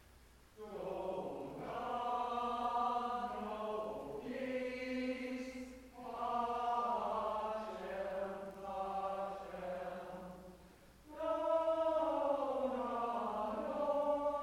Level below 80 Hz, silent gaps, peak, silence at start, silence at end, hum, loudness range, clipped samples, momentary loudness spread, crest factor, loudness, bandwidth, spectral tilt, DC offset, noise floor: -66 dBFS; none; -24 dBFS; 0 s; 0 s; none; 6 LU; under 0.1%; 12 LU; 16 dB; -40 LUFS; 16 kHz; -5.5 dB/octave; under 0.1%; -63 dBFS